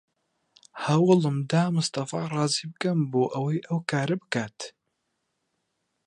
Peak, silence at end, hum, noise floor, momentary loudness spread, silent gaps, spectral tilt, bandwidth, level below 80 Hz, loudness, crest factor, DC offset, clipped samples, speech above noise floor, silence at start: -6 dBFS; 1.35 s; none; -78 dBFS; 12 LU; none; -5.5 dB/octave; 11.5 kHz; -72 dBFS; -26 LUFS; 20 dB; under 0.1%; under 0.1%; 53 dB; 0.75 s